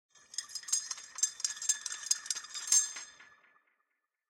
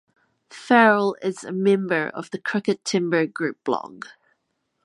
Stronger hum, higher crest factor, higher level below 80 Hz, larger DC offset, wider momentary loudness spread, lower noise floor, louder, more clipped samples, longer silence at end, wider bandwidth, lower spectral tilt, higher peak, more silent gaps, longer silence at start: neither; first, 26 dB vs 20 dB; second, -88 dBFS vs -76 dBFS; neither; about the same, 15 LU vs 16 LU; first, -83 dBFS vs -74 dBFS; second, -32 LUFS vs -22 LUFS; neither; first, 1.05 s vs 0.85 s; first, 17 kHz vs 11.5 kHz; second, 5 dB/octave vs -5 dB/octave; second, -12 dBFS vs -2 dBFS; neither; second, 0.35 s vs 0.5 s